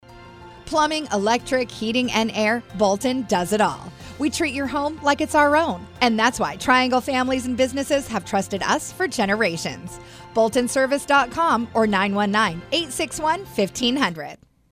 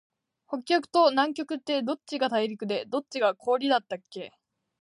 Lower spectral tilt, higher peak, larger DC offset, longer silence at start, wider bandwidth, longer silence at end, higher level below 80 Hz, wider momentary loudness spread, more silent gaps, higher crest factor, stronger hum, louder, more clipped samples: about the same, -3.5 dB/octave vs -4.5 dB/octave; first, -2 dBFS vs -10 dBFS; neither; second, 0.1 s vs 0.5 s; first, 16 kHz vs 11 kHz; second, 0.35 s vs 0.55 s; first, -50 dBFS vs -82 dBFS; second, 7 LU vs 15 LU; neither; about the same, 18 dB vs 18 dB; neither; first, -21 LUFS vs -27 LUFS; neither